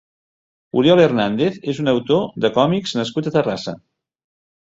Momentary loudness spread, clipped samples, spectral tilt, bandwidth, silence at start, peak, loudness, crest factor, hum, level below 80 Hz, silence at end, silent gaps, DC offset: 10 LU; under 0.1%; -6.5 dB/octave; 8 kHz; 0.75 s; -2 dBFS; -18 LUFS; 18 dB; none; -58 dBFS; 1 s; none; under 0.1%